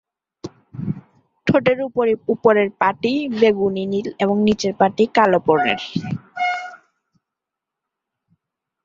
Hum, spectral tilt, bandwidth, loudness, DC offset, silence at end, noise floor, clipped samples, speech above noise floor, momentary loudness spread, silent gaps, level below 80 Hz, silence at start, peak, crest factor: none; -6 dB/octave; 7.6 kHz; -19 LUFS; under 0.1%; 2.1 s; -84 dBFS; under 0.1%; 67 dB; 14 LU; none; -56 dBFS; 0.45 s; -2 dBFS; 18 dB